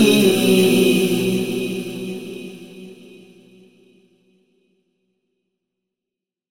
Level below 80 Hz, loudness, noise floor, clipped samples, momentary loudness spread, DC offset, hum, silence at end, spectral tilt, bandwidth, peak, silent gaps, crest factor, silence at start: -60 dBFS; -17 LUFS; -86 dBFS; under 0.1%; 24 LU; under 0.1%; none; 3.55 s; -5 dB/octave; 16.5 kHz; -2 dBFS; none; 18 dB; 0 s